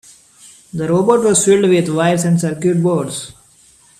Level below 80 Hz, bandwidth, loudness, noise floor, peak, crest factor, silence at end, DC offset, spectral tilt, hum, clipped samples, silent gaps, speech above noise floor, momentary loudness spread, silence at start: -54 dBFS; 14 kHz; -14 LUFS; -49 dBFS; 0 dBFS; 16 dB; 0.7 s; under 0.1%; -5.5 dB/octave; none; under 0.1%; none; 35 dB; 13 LU; 0.75 s